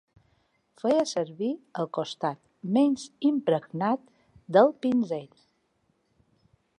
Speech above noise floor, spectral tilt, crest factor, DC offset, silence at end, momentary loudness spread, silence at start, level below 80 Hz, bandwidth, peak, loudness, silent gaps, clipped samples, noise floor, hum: 46 dB; -6 dB/octave; 20 dB; under 0.1%; 1.55 s; 11 LU; 0.85 s; -74 dBFS; 11 kHz; -8 dBFS; -27 LUFS; none; under 0.1%; -72 dBFS; none